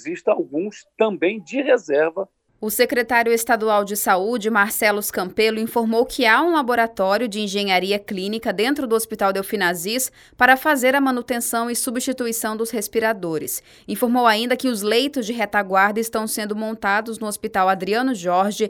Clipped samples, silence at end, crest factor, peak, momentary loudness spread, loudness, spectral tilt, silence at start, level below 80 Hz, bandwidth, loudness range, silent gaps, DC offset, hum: under 0.1%; 0 s; 20 dB; 0 dBFS; 8 LU; -20 LUFS; -3 dB/octave; 0 s; -58 dBFS; over 20 kHz; 3 LU; none; under 0.1%; none